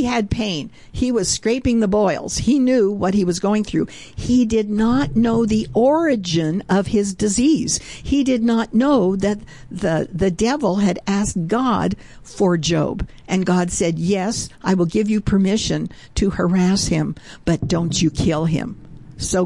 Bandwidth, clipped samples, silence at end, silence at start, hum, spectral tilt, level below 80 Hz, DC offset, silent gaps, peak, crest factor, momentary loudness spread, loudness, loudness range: 11.5 kHz; under 0.1%; 0 s; 0 s; none; -5.5 dB/octave; -38 dBFS; 0.4%; none; -6 dBFS; 12 dB; 8 LU; -19 LUFS; 2 LU